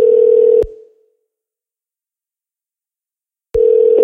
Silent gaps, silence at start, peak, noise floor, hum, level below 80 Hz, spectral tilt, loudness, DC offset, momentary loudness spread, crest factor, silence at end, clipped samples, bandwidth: none; 0 s; -2 dBFS; -90 dBFS; none; -40 dBFS; -8.5 dB/octave; -11 LUFS; under 0.1%; 11 LU; 14 dB; 0 s; under 0.1%; 3.1 kHz